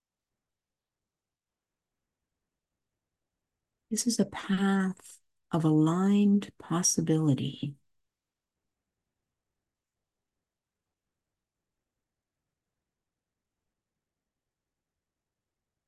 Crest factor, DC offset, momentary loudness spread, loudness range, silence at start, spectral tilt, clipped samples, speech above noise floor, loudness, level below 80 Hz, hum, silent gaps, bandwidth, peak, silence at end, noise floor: 20 dB; under 0.1%; 10 LU; 10 LU; 3.9 s; -5 dB/octave; under 0.1%; over 63 dB; -28 LUFS; -72 dBFS; none; none; 12.5 kHz; -14 dBFS; 8.15 s; under -90 dBFS